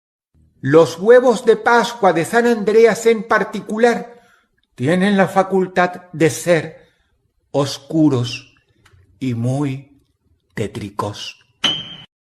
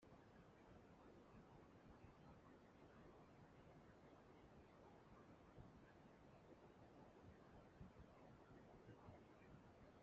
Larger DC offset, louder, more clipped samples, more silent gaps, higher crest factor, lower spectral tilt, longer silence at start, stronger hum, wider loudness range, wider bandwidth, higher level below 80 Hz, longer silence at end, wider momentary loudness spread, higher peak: neither; first, -16 LUFS vs -67 LUFS; neither; neither; about the same, 16 dB vs 18 dB; about the same, -5.5 dB/octave vs -6 dB/octave; first, 0.65 s vs 0 s; neither; first, 10 LU vs 1 LU; first, 13.5 kHz vs 7.4 kHz; first, -58 dBFS vs -78 dBFS; first, 0.25 s vs 0 s; first, 14 LU vs 3 LU; first, 0 dBFS vs -48 dBFS